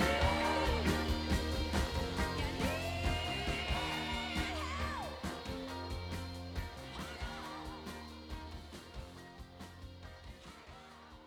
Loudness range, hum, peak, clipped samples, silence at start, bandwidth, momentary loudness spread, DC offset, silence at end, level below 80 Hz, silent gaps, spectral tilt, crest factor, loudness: 13 LU; none; -20 dBFS; under 0.1%; 0 s; 19 kHz; 19 LU; under 0.1%; 0 s; -44 dBFS; none; -5 dB/octave; 18 dB; -38 LUFS